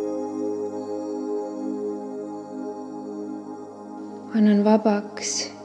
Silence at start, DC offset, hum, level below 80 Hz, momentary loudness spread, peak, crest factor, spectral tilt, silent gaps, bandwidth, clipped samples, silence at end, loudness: 0 s; under 0.1%; none; -80 dBFS; 18 LU; -6 dBFS; 20 dB; -5 dB/octave; none; 9.8 kHz; under 0.1%; 0 s; -26 LUFS